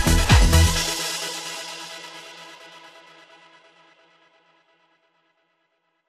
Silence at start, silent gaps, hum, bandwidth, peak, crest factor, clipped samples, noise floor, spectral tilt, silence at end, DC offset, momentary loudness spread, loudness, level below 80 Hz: 0 s; none; none; 15 kHz; -4 dBFS; 20 dB; under 0.1%; -71 dBFS; -3.5 dB/octave; 3.55 s; under 0.1%; 26 LU; -20 LUFS; -28 dBFS